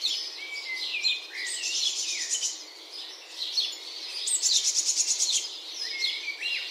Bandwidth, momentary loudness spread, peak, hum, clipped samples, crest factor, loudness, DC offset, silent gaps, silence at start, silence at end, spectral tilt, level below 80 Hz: 16 kHz; 13 LU; -10 dBFS; none; under 0.1%; 20 dB; -27 LUFS; under 0.1%; none; 0 s; 0 s; 5.5 dB/octave; -88 dBFS